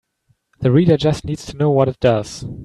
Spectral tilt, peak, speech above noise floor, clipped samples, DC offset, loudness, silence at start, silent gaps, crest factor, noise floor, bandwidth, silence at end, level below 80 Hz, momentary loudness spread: -7.5 dB/octave; -2 dBFS; 47 dB; under 0.1%; under 0.1%; -17 LUFS; 0.6 s; none; 16 dB; -64 dBFS; 12 kHz; 0 s; -42 dBFS; 11 LU